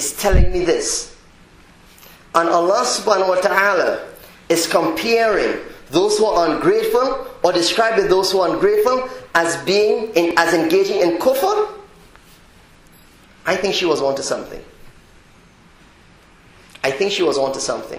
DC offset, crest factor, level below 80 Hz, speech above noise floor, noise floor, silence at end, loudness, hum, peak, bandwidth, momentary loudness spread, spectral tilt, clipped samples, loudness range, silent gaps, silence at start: under 0.1%; 18 dB; -32 dBFS; 31 dB; -48 dBFS; 0 s; -17 LUFS; none; 0 dBFS; 16 kHz; 8 LU; -3.5 dB/octave; under 0.1%; 7 LU; none; 0 s